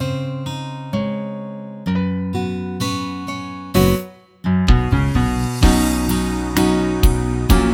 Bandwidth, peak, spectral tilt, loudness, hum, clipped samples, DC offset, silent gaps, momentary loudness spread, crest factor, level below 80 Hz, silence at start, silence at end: 18.5 kHz; 0 dBFS; -6 dB/octave; -19 LUFS; none; under 0.1%; under 0.1%; none; 11 LU; 18 dB; -24 dBFS; 0 s; 0 s